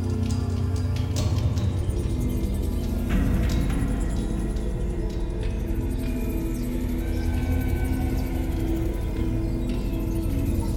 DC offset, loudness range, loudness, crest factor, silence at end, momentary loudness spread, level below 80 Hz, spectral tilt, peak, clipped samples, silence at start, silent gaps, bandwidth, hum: under 0.1%; 3 LU; -27 LUFS; 12 dB; 0 s; 4 LU; -28 dBFS; -7 dB/octave; -12 dBFS; under 0.1%; 0 s; none; 16.5 kHz; none